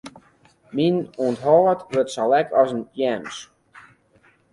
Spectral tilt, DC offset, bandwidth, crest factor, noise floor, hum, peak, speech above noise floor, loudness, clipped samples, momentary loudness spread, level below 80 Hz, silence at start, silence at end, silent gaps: -6 dB/octave; under 0.1%; 11.5 kHz; 18 dB; -58 dBFS; none; -4 dBFS; 38 dB; -21 LUFS; under 0.1%; 13 LU; -64 dBFS; 0.05 s; 1.1 s; none